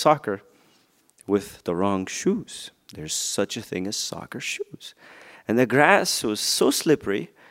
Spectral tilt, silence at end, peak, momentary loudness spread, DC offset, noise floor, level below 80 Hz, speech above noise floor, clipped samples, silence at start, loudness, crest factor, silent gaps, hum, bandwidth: -3.5 dB/octave; 0.25 s; -2 dBFS; 19 LU; under 0.1%; -62 dBFS; -62 dBFS; 38 dB; under 0.1%; 0 s; -23 LUFS; 24 dB; none; none; 16 kHz